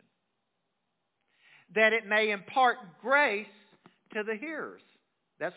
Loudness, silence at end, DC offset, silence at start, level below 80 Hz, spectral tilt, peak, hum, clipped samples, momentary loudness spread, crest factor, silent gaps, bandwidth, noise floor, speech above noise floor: -28 LUFS; 0.05 s; under 0.1%; 1.75 s; under -90 dBFS; -0.5 dB/octave; -10 dBFS; none; under 0.1%; 15 LU; 22 dB; none; 4 kHz; -82 dBFS; 53 dB